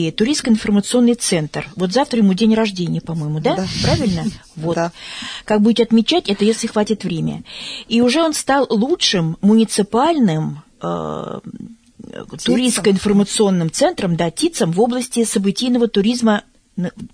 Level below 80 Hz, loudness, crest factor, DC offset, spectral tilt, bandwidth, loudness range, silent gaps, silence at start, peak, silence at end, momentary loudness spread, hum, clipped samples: -44 dBFS; -17 LUFS; 14 dB; under 0.1%; -5 dB/octave; 11 kHz; 3 LU; none; 0 s; -2 dBFS; 0.05 s; 12 LU; none; under 0.1%